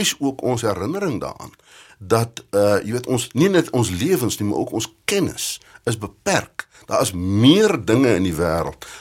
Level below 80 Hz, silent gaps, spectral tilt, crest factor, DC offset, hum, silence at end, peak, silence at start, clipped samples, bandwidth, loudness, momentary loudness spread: -48 dBFS; none; -5 dB/octave; 18 dB; under 0.1%; none; 0 s; -2 dBFS; 0 s; under 0.1%; 17 kHz; -20 LUFS; 10 LU